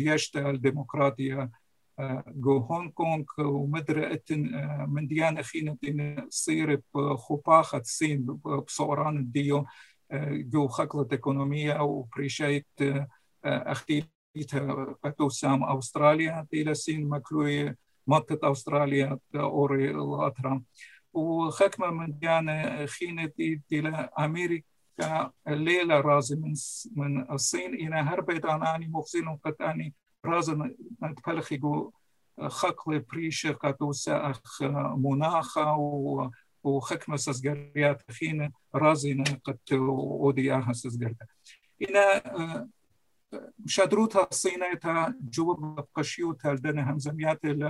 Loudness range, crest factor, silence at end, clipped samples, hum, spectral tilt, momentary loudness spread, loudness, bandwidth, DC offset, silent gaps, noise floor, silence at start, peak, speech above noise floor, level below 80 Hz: 4 LU; 22 dB; 0 s; under 0.1%; none; -5.5 dB/octave; 10 LU; -29 LUFS; 12.5 kHz; under 0.1%; 14.15-14.34 s; -74 dBFS; 0 s; -6 dBFS; 46 dB; -70 dBFS